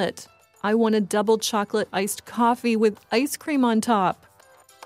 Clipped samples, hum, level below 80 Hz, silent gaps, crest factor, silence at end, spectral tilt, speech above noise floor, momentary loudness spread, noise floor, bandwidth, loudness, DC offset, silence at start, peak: under 0.1%; none; -70 dBFS; none; 14 dB; 0.75 s; -4.5 dB/octave; 31 dB; 7 LU; -54 dBFS; 16 kHz; -23 LUFS; under 0.1%; 0 s; -8 dBFS